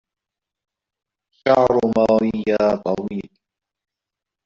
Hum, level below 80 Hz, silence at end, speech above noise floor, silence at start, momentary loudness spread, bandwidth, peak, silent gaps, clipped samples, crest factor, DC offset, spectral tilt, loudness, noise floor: none; -52 dBFS; 1.2 s; 68 dB; 1.45 s; 10 LU; 7.6 kHz; -2 dBFS; none; under 0.1%; 18 dB; under 0.1%; -5.5 dB/octave; -18 LUFS; -86 dBFS